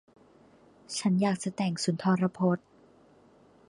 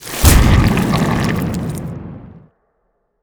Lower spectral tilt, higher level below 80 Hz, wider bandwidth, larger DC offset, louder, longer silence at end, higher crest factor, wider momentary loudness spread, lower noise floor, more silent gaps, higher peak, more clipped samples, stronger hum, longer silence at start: about the same, -6 dB/octave vs -5 dB/octave; second, -72 dBFS vs -20 dBFS; second, 11 kHz vs over 20 kHz; neither; second, -29 LUFS vs -15 LUFS; first, 1.1 s vs 0.85 s; about the same, 18 dB vs 16 dB; second, 5 LU vs 20 LU; second, -59 dBFS vs -65 dBFS; neither; second, -14 dBFS vs 0 dBFS; neither; neither; first, 0.9 s vs 0 s